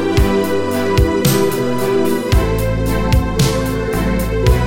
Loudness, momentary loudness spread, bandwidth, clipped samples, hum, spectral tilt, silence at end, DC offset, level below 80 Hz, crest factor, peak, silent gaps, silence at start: -16 LUFS; 4 LU; 16.5 kHz; under 0.1%; none; -6 dB/octave; 0 s; under 0.1%; -20 dBFS; 14 dB; 0 dBFS; none; 0 s